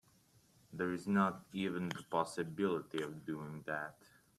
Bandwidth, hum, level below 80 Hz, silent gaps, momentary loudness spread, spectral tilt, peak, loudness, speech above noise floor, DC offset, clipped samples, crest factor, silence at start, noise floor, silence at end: 13.5 kHz; none; -76 dBFS; none; 10 LU; -6 dB/octave; -20 dBFS; -39 LUFS; 31 dB; under 0.1%; under 0.1%; 20 dB; 0.7 s; -69 dBFS; 0.45 s